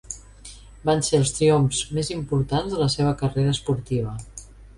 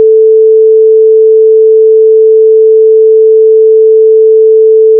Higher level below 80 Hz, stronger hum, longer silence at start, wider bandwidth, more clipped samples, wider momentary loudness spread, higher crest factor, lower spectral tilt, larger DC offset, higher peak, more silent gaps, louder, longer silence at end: first, -44 dBFS vs under -90 dBFS; neither; about the same, 0.1 s vs 0 s; first, 11.5 kHz vs 0.5 kHz; second, under 0.1% vs 0.6%; first, 21 LU vs 0 LU; first, 16 dB vs 4 dB; second, -5.5 dB/octave vs -11 dB/octave; neither; second, -6 dBFS vs 0 dBFS; neither; second, -23 LUFS vs -4 LUFS; about the same, 0.05 s vs 0 s